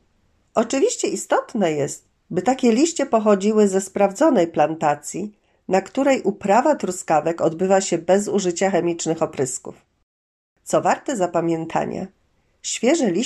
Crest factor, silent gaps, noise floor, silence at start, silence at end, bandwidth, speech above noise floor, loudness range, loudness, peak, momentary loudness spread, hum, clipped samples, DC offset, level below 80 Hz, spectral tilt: 16 dB; 10.03-10.56 s; -63 dBFS; 0.55 s; 0 s; 13 kHz; 43 dB; 5 LU; -20 LUFS; -4 dBFS; 11 LU; none; under 0.1%; under 0.1%; -64 dBFS; -4.5 dB/octave